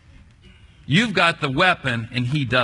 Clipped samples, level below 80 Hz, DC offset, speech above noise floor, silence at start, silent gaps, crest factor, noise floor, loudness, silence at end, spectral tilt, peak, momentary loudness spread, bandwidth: under 0.1%; -50 dBFS; under 0.1%; 29 dB; 0.9 s; none; 20 dB; -48 dBFS; -19 LUFS; 0 s; -5.5 dB/octave; -2 dBFS; 6 LU; 11 kHz